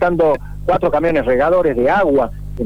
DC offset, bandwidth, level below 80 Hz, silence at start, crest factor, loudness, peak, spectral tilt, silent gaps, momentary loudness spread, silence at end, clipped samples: 2%; 19.5 kHz; -32 dBFS; 0 s; 8 dB; -15 LUFS; -6 dBFS; -8 dB/octave; none; 5 LU; 0 s; under 0.1%